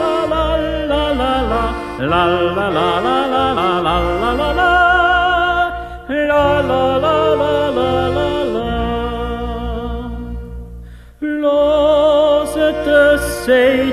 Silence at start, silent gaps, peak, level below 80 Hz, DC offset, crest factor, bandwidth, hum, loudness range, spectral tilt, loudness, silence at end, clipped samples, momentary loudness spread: 0 s; none; 0 dBFS; -30 dBFS; under 0.1%; 14 dB; 14 kHz; none; 6 LU; -5.5 dB/octave; -15 LUFS; 0 s; under 0.1%; 11 LU